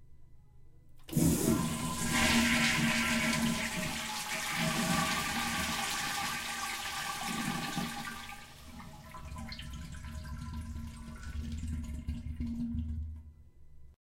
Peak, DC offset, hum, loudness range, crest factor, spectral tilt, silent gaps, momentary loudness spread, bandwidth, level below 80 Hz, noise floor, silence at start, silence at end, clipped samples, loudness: -16 dBFS; under 0.1%; none; 14 LU; 20 dB; -3.5 dB/octave; none; 18 LU; 16 kHz; -46 dBFS; -54 dBFS; 0 s; 0.2 s; under 0.1%; -33 LUFS